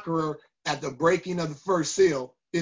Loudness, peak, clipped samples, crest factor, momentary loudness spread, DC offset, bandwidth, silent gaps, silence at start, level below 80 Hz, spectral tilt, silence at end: -27 LUFS; -10 dBFS; under 0.1%; 16 dB; 10 LU; under 0.1%; 7.6 kHz; none; 0 s; -62 dBFS; -5 dB/octave; 0 s